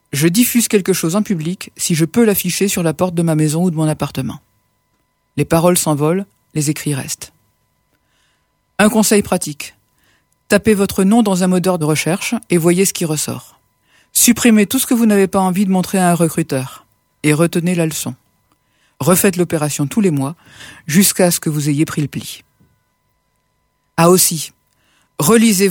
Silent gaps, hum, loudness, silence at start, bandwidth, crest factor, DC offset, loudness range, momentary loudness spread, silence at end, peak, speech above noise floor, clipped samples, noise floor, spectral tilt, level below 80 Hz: none; none; -15 LUFS; 0.15 s; 19.5 kHz; 16 dB; under 0.1%; 4 LU; 13 LU; 0 s; 0 dBFS; 50 dB; under 0.1%; -65 dBFS; -4.5 dB/octave; -50 dBFS